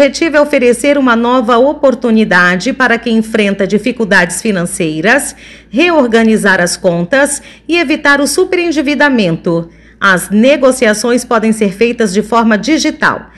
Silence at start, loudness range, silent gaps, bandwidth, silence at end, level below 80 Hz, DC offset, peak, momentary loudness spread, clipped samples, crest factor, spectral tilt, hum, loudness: 0 s; 2 LU; none; 12.5 kHz; 0.1 s; -42 dBFS; under 0.1%; 0 dBFS; 5 LU; 0.4%; 10 dB; -4.5 dB/octave; none; -10 LUFS